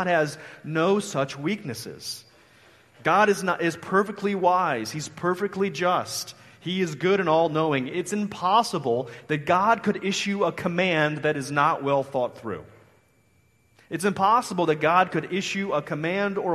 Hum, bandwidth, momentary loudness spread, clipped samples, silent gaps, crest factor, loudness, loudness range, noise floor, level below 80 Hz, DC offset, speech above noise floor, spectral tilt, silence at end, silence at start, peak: none; 13.5 kHz; 11 LU; under 0.1%; none; 20 dB; -24 LUFS; 3 LU; -63 dBFS; -66 dBFS; under 0.1%; 39 dB; -5 dB/octave; 0 s; 0 s; -6 dBFS